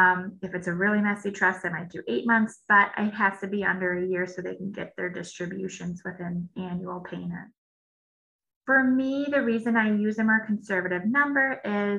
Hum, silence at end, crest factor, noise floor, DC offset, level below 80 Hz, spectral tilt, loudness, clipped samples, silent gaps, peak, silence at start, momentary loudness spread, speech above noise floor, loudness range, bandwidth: none; 0 s; 20 dB; under -90 dBFS; under 0.1%; -66 dBFS; -6.5 dB/octave; -26 LUFS; under 0.1%; 7.58-8.39 s, 8.56-8.61 s; -8 dBFS; 0 s; 14 LU; over 64 dB; 10 LU; 10 kHz